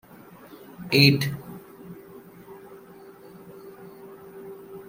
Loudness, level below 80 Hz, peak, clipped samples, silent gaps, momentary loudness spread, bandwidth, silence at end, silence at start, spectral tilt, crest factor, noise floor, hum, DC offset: -20 LUFS; -62 dBFS; -2 dBFS; under 0.1%; none; 29 LU; 16.5 kHz; 0.05 s; 0.8 s; -5.5 dB/octave; 26 dB; -48 dBFS; none; under 0.1%